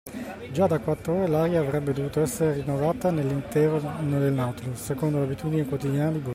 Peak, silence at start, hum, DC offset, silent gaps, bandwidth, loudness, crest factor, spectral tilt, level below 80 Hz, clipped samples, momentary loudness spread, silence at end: -10 dBFS; 0.05 s; none; under 0.1%; none; 16 kHz; -26 LUFS; 14 dB; -7.5 dB/octave; -52 dBFS; under 0.1%; 5 LU; 0 s